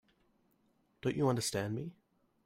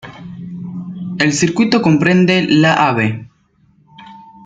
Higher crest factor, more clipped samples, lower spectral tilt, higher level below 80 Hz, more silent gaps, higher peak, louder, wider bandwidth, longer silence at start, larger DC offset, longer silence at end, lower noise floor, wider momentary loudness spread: about the same, 18 dB vs 16 dB; neither; about the same, -5 dB/octave vs -5.5 dB/octave; second, -68 dBFS vs -54 dBFS; neither; second, -20 dBFS vs 0 dBFS; second, -35 LUFS vs -13 LUFS; first, 16 kHz vs 9.4 kHz; first, 1.05 s vs 0.05 s; neither; first, 0.55 s vs 0.25 s; first, -74 dBFS vs -54 dBFS; second, 10 LU vs 18 LU